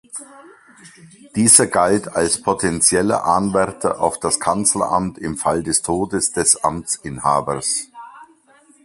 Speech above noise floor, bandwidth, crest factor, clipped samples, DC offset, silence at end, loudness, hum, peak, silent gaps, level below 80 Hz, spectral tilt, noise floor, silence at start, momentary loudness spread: 34 dB; 16 kHz; 20 dB; under 0.1%; under 0.1%; 0.6 s; -17 LUFS; none; 0 dBFS; none; -48 dBFS; -3 dB/octave; -52 dBFS; 0.15 s; 11 LU